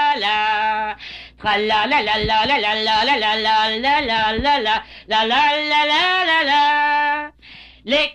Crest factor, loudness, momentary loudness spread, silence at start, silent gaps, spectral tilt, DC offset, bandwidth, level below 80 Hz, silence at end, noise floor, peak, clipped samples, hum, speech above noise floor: 12 dB; -17 LUFS; 8 LU; 0 s; none; -3 dB/octave; under 0.1%; 9.6 kHz; -44 dBFS; 0 s; -43 dBFS; -8 dBFS; under 0.1%; none; 26 dB